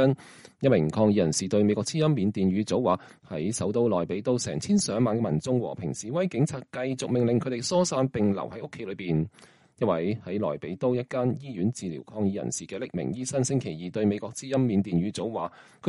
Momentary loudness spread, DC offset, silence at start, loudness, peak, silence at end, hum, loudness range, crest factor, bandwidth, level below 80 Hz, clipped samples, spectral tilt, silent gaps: 9 LU; under 0.1%; 0 s; -27 LUFS; -10 dBFS; 0 s; none; 5 LU; 16 dB; 11.5 kHz; -60 dBFS; under 0.1%; -6 dB/octave; none